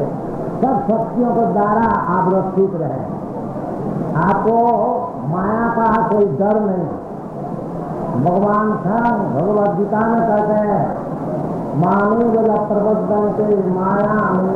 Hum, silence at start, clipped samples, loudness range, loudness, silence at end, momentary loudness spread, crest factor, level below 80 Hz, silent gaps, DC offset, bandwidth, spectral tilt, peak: none; 0 s; under 0.1%; 2 LU; -17 LUFS; 0 s; 10 LU; 10 dB; -44 dBFS; none; under 0.1%; 5.6 kHz; -10.5 dB/octave; -6 dBFS